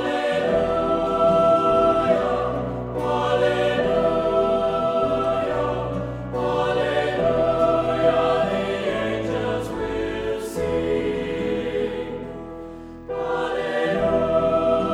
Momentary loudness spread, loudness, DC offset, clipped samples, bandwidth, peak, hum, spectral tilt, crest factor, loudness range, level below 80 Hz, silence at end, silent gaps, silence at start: 9 LU; -22 LUFS; under 0.1%; under 0.1%; 13 kHz; -6 dBFS; none; -6.5 dB/octave; 16 dB; 6 LU; -42 dBFS; 0 s; none; 0 s